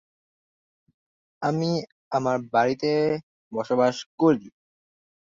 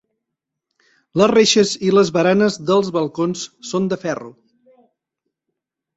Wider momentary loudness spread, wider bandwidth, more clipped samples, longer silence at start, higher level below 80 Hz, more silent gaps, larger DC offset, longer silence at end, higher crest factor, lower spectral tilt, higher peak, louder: second, 8 LU vs 12 LU; about the same, 7.6 kHz vs 8.2 kHz; neither; first, 1.4 s vs 1.15 s; second, -68 dBFS vs -60 dBFS; first, 1.92-2.11 s, 3.23-3.51 s, 4.06-4.18 s vs none; neither; second, 0.8 s vs 1.65 s; about the same, 18 dB vs 18 dB; first, -6.5 dB/octave vs -4.5 dB/octave; second, -8 dBFS vs -2 dBFS; second, -25 LUFS vs -17 LUFS